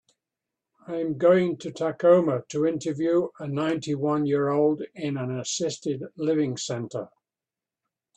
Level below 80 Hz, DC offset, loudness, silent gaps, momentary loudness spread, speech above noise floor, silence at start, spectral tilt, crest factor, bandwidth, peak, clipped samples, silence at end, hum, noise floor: -70 dBFS; under 0.1%; -25 LUFS; none; 11 LU; over 65 dB; 0.9 s; -5.5 dB/octave; 18 dB; 9 kHz; -6 dBFS; under 0.1%; 1.1 s; none; under -90 dBFS